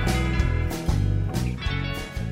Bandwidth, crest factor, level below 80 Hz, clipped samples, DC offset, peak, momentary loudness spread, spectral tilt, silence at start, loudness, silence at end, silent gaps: 16 kHz; 14 dB; -28 dBFS; under 0.1%; under 0.1%; -10 dBFS; 5 LU; -6 dB/octave; 0 s; -26 LUFS; 0 s; none